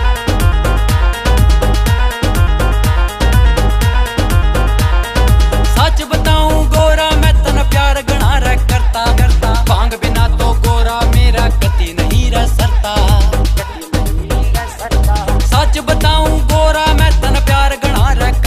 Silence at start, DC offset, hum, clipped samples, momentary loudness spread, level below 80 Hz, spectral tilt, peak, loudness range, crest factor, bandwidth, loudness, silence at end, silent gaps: 0 s; 0.6%; none; under 0.1%; 4 LU; -12 dBFS; -5 dB/octave; 0 dBFS; 2 LU; 10 dB; 15.5 kHz; -13 LUFS; 0 s; none